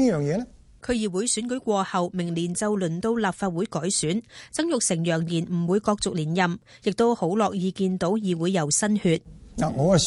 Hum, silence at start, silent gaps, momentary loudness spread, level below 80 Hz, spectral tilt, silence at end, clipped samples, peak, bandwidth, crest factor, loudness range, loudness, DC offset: none; 0 s; none; 7 LU; -52 dBFS; -5 dB/octave; 0 s; under 0.1%; -8 dBFS; 11.5 kHz; 18 dB; 2 LU; -25 LUFS; under 0.1%